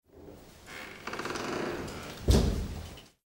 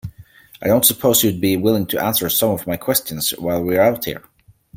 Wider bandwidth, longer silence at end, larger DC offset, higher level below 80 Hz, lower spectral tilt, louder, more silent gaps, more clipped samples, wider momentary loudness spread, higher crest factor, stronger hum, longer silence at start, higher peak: about the same, 16 kHz vs 17 kHz; second, 0.2 s vs 0.55 s; neither; first, -38 dBFS vs -50 dBFS; first, -5.5 dB/octave vs -4 dB/octave; second, -33 LUFS vs -17 LUFS; neither; neither; first, 24 LU vs 12 LU; about the same, 22 dB vs 18 dB; neither; about the same, 0.15 s vs 0.05 s; second, -12 dBFS vs 0 dBFS